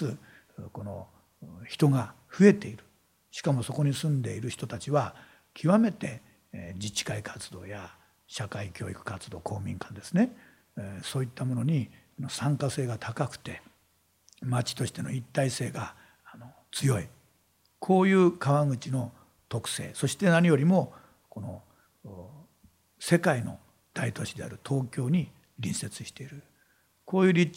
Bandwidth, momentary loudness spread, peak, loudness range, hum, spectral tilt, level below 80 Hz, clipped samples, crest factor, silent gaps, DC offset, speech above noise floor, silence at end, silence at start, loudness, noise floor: 16 kHz; 21 LU; -6 dBFS; 7 LU; none; -6 dB/octave; -66 dBFS; under 0.1%; 22 dB; none; under 0.1%; 41 dB; 0.05 s; 0 s; -29 LUFS; -69 dBFS